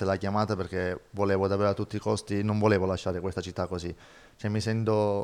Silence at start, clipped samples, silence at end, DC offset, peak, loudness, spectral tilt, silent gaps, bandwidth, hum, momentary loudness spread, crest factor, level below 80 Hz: 0 s; under 0.1%; 0 s; under 0.1%; -8 dBFS; -29 LUFS; -6.5 dB/octave; none; 11 kHz; none; 8 LU; 20 dB; -58 dBFS